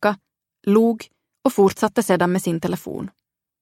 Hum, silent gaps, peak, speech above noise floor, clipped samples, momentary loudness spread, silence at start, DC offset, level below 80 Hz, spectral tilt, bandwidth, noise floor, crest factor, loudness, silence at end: none; none; -4 dBFS; 32 dB; under 0.1%; 14 LU; 0 s; under 0.1%; -58 dBFS; -6 dB/octave; 16.5 kHz; -51 dBFS; 18 dB; -20 LUFS; 0.55 s